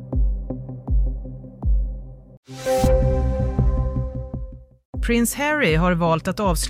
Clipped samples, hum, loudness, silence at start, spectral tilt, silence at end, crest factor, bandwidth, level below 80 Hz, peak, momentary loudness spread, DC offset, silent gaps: under 0.1%; none; -22 LUFS; 0 s; -5.5 dB/octave; 0 s; 16 dB; 15.5 kHz; -24 dBFS; -6 dBFS; 16 LU; under 0.1%; 2.37-2.43 s, 4.85-4.93 s